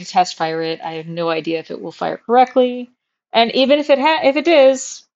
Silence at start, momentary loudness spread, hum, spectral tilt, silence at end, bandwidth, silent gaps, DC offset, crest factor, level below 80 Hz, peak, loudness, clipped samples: 0 s; 12 LU; none; -4 dB/octave; 0.15 s; 8 kHz; none; under 0.1%; 16 dB; -68 dBFS; 0 dBFS; -16 LUFS; under 0.1%